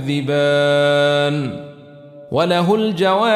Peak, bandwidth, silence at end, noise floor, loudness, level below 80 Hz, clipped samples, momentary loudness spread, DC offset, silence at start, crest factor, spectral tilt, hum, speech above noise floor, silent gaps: -4 dBFS; 14 kHz; 0 s; -39 dBFS; -16 LUFS; -60 dBFS; under 0.1%; 9 LU; under 0.1%; 0 s; 14 dB; -6 dB/octave; none; 24 dB; none